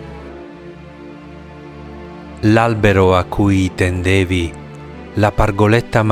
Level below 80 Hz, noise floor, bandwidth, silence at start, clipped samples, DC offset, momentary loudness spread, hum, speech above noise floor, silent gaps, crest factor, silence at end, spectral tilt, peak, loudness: -34 dBFS; -35 dBFS; 14.5 kHz; 0 s; under 0.1%; under 0.1%; 22 LU; none; 21 dB; none; 16 dB; 0 s; -7 dB/octave; 0 dBFS; -15 LUFS